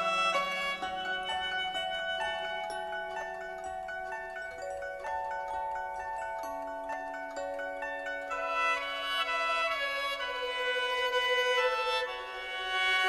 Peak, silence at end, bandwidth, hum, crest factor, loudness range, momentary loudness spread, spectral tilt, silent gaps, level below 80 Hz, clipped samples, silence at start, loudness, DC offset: -16 dBFS; 0 s; 13 kHz; none; 16 dB; 8 LU; 11 LU; -1 dB/octave; none; -62 dBFS; under 0.1%; 0 s; -33 LUFS; under 0.1%